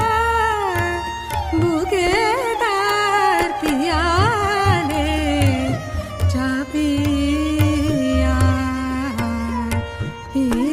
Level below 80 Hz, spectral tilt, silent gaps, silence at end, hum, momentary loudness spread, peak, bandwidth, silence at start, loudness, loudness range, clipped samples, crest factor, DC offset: -30 dBFS; -5.5 dB/octave; none; 0 s; none; 7 LU; -2 dBFS; 15.5 kHz; 0 s; -19 LUFS; 2 LU; under 0.1%; 16 dB; under 0.1%